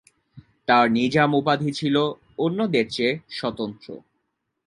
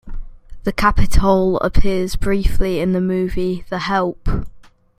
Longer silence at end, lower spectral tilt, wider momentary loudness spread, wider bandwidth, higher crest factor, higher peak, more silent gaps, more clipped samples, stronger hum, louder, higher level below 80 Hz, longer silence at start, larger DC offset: first, 0.7 s vs 0.4 s; about the same, -6 dB/octave vs -6.5 dB/octave; first, 14 LU vs 10 LU; second, 11.5 kHz vs 14 kHz; about the same, 20 dB vs 16 dB; second, -4 dBFS vs 0 dBFS; neither; neither; neither; second, -22 LUFS vs -19 LUFS; second, -62 dBFS vs -22 dBFS; first, 0.35 s vs 0.05 s; neither